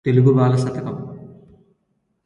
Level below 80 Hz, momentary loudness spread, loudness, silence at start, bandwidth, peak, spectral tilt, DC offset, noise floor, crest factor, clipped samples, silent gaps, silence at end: -56 dBFS; 21 LU; -18 LUFS; 0.05 s; 10.5 kHz; -2 dBFS; -9 dB/octave; under 0.1%; -69 dBFS; 18 dB; under 0.1%; none; 0.95 s